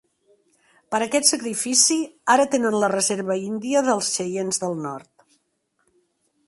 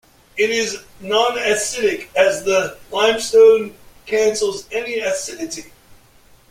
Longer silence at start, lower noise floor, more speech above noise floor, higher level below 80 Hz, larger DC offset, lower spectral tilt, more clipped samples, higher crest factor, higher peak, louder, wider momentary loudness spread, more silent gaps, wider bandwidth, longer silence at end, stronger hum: first, 0.9 s vs 0.35 s; first, -71 dBFS vs -50 dBFS; first, 50 dB vs 32 dB; second, -70 dBFS vs -54 dBFS; neither; about the same, -2.5 dB/octave vs -2 dB/octave; neither; first, 22 dB vs 16 dB; about the same, -2 dBFS vs -2 dBFS; second, -21 LUFS vs -17 LUFS; second, 10 LU vs 15 LU; neither; second, 12 kHz vs 16 kHz; first, 1.45 s vs 0.55 s; neither